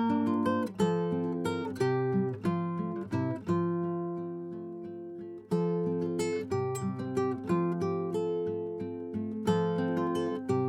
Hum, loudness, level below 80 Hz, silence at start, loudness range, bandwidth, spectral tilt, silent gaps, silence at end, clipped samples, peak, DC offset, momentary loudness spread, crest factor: none; -32 LUFS; -68 dBFS; 0 s; 3 LU; 12.5 kHz; -7.5 dB/octave; none; 0 s; under 0.1%; -14 dBFS; under 0.1%; 9 LU; 16 dB